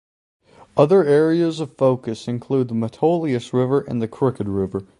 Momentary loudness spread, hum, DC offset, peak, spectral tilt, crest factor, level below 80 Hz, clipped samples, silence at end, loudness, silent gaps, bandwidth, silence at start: 10 LU; none; under 0.1%; 0 dBFS; -8 dB/octave; 18 dB; -54 dBFS; under 0.1%; 0.15 s; -20 LUFS; none; 11 kHz; 0.75 s